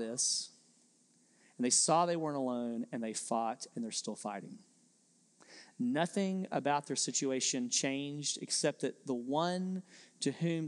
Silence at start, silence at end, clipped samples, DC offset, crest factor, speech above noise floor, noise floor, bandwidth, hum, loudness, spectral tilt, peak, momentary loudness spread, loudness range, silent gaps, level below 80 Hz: 0 s; 0 s; under 0.1%; under 0.1%; 20 dB; 35 dB; -70 dBFS; 12 kHz; none; -34 LUFS; -3 dB/octave; -16 dBFS; 11 LU; 6 LU; none; under -90 dBFS